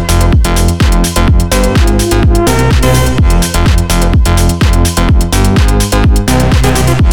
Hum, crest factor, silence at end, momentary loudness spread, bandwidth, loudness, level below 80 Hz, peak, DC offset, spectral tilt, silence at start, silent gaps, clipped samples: none; 8 dB; 0 s; 1 LU; over 20 kHz; -9 LUFS; -10 dBFS; 0 dBFS; under 0.1%; -5 dB/octave; 0 s; none; 0.3%